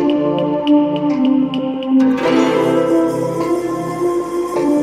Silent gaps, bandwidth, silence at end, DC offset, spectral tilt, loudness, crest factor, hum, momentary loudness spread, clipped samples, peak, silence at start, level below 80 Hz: none; 14 kHz; 0 s; under 0.1%; -6.5 dB/octave; -16 LUFS; 12 dB; none; 5 LU; under 0.1%; -2 dBFS; 0 s; -52 dBFS